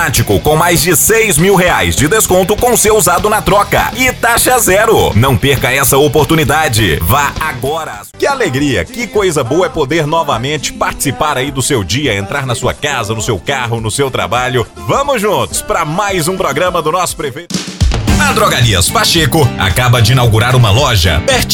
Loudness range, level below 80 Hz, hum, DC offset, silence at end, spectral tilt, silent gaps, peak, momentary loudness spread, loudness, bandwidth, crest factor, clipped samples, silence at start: 5 LU; -26 dBFS; none; 0.2%; 0 s; -4 dB/octave; none; 0 dBFS; 7 LU; -11 LUFS; 18 kHz; 10 dB; under 0.1%; 0 s